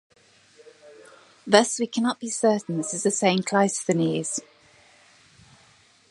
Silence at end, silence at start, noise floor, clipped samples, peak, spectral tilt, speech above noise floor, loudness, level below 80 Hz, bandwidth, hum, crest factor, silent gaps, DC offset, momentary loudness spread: 1.7 s; 0.85 s; -57 dBFS; under 0.1%; -2 dBFS; -4 dB/octave; 35 dB; -23 LUFS; -72 dBFS; 11.5 kHz; none; 24 dB; none; under 0.1%; 9 LU